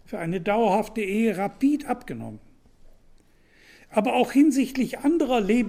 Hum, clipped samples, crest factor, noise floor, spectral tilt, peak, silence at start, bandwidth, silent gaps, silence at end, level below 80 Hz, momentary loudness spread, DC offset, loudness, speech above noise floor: none; under 0.1%; 18 dB; -56 dBFS; -6 dB/octave; -8 dBFS; 0.1 s; 16 kHz; none; 0 s; -50 dBFS; 12 LU; under 0.1%; -24 LUFS; 34 dB